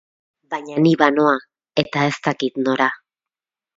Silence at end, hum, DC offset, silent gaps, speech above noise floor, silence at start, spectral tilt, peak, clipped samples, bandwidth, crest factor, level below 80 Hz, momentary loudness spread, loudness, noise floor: 0.8 s; none; under 0.1%; none; 71 dB; 0.5 s; -6 dB/octave; 0 dBFS; under 0.1%; 7.8 kHz; 20 dB; -64 dBFS; 12 LU; -19 LUFS; -89 dBFS